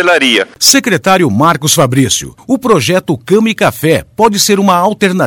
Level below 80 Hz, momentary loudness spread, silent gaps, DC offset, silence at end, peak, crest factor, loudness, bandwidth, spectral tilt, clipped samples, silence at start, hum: -44 dBFS; 5 LU; none; under 0.1%; 0 s; 0 dBFS; 10 dB; -9 LUFS; over 20 kHz; -3.5 dB/octave; 0.4%; 0 s; none